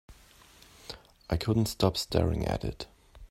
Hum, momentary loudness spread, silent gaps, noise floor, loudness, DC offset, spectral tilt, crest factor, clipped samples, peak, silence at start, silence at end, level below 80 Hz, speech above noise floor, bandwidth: none; 18 LU; none; -57 dBFS; -30 LUFS; under 0.1%; -6 dB/octave; 24 dB; under 0.1%; -8 dBFS; 0.1 s; 0.05 s; -46 dBFS; 28 dB; 16 kHz